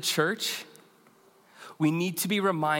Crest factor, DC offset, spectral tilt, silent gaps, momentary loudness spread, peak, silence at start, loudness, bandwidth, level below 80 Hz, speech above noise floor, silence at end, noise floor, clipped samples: 20 dB; under 0.1%; -4 dB/octave; none; 22 LU; -10 dBFS; 0 s; -28 LUFS; 17 kHz; -84 dBFS; 33 dB; 0 s; -60 dBFS; under 0.1%